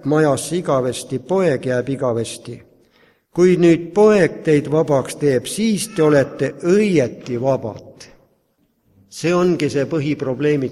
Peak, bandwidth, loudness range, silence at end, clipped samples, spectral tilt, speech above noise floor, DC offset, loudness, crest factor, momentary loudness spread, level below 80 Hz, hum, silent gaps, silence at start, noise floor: -2 dBFS; 13.5 kHz; 6 LU; 0 s; under 0.1%; -6 dB/octave; 47 dB; under 0.1%; -17 LUFS; 16 dB; 11 LU; -54 dBFS; none; none; 0.05 s; -64 dBFS